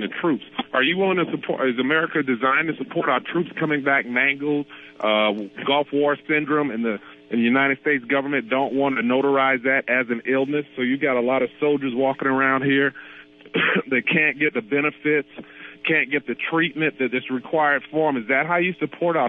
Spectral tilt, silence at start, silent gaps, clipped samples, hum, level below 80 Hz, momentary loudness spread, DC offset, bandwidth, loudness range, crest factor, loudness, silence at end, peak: -8.5 dB/octave; 0 s; none; under 0.1%; none; -74 dBFS; 6 LU; under 0.1%; 4 kHz; 2 LU; 16 dB; -21 LUFS; 0 s; -6 dBFS